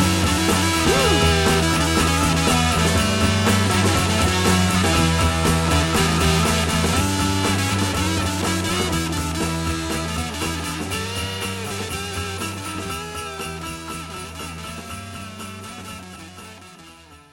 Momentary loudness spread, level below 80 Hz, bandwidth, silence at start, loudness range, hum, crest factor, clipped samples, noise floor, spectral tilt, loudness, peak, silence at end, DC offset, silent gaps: 15 LU; -32 dBFS; 17 kHz; 0 s; 13 LU; none; 16 dB; under 0.1%; -45 dBFS; -4 dB/octave; -20 LUFS; -4 dBFS; 0.15 s; under 0.1%; none